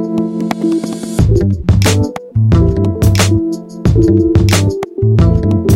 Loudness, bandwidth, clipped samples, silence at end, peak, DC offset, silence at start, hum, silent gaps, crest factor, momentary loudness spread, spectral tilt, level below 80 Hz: -12 LUFS; 16 kHz; under 0.1%; 0 s; 0 dBFS; under 0.1%; 0 s; none; none; 12 dB; 7 LU; -6.5 dB/octave; -22 dBFS